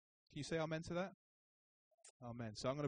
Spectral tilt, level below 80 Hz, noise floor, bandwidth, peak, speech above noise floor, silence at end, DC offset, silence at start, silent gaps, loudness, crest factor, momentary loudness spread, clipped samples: -5.5 dB/octave; -72 dBFS; under -90 dBFS; 9.6 kHz; -28 dBFS; over 46 dB; 0 s; under 0.1%; 0.3 s; 1.14-1.98 s, 2.10-2.20 s; -46 LUFS; 18 dB; 16 LU; under 0.1%